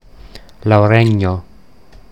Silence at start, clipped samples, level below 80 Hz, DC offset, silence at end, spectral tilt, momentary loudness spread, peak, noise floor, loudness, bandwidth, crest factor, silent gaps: 0.25 s; under 0.1%; -42 dBFS; 0.8%; 0.7 s; -8.5 dB/octave; 13 LU; 0 dBFS; -44 dBFS; -13 LUFS; 8.4 kHz; 16 dB; none